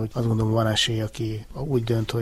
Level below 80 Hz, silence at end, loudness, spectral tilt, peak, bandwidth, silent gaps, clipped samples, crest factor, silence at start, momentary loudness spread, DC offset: -44 dBFS; 0 s; -24 LUFS; -5.5 dB/octave; -8 dBFS; 14 kHz; none; under 0.1%; 16 dB; 0 s; 9 LU; under 0.1%